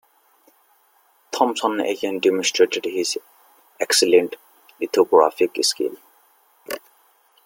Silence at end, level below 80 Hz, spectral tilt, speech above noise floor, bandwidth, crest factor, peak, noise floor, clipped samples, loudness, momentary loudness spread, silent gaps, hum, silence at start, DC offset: 0.65 s; -70 dBFS; -2 dB/octave; 41 dB; 17 kHz; 20 dB; -2 dBFS; -60 dBFS; under 0.1%; -20 LUFS; 16 LU; none; none; 1.3 s; under 0.1%